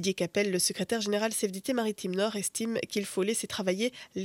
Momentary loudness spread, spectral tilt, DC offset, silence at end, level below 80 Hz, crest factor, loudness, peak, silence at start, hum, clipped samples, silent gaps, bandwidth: 4 LU; -3.5 dB/octave; under 0.1%; 0 s; -72 dBFS; 16 dB; -30 LUFS; -14 dBFS; 0 s; none; under 0.1%; none; 17 kHz